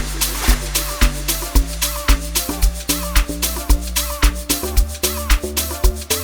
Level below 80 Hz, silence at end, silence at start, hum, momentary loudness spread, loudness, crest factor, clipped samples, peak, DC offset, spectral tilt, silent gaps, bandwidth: -20 dBFS; 0 s; 0 s; none; 3 LU; -19 LUFS; 18 dB; under 0.1%; 0 dBFS; under 0.1%; -3 dB/octave; none; over 20 kHz